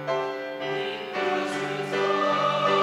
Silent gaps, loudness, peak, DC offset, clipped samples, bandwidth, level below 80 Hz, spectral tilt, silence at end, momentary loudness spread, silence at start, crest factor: none; -26 LUFS; -10 dBFS; under 0.1%; under 0.1%; 14 kHz; -74 dBFS; -4.5 dB/octave; 0 s; 7 LU; 0 s; 16 dB